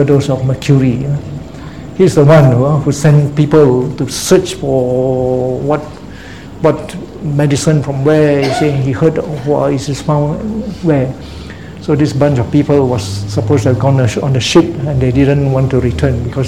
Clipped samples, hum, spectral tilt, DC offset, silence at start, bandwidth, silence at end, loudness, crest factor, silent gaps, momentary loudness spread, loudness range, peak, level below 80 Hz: 0.3%; none; -7 dB/octave; 0.8%; 0 s; 14 kHz; 0 s; -12 LUFS; 12 dB; none; 13 LU; 5 LU; 0 dBFS; -32 dBFS